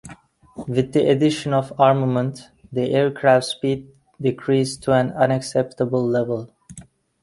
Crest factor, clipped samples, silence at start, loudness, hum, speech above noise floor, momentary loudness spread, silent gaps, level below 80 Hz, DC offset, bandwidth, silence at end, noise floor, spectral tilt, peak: 20 dB; under 0.1%; 0.05 s; -20 LUFS; none; 26 dB; 11 LU; none; -56 dBFS; under 0.1%; 11.5 kHz; 0.4 s; -46 dBFS; -6.5 dB/octave; -2 dBFS